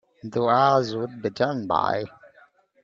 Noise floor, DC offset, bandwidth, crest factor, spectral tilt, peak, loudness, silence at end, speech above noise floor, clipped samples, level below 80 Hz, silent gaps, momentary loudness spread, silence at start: -57 dBFS; under 0.1%; 7.6 kHz; 20 dB; -6.5 dB/octave; -6 dBFS; -23 LUFS; 0.75 s; 34 dB; under 0.1%; -64 dBFS; none; 11 LU; 0.25 s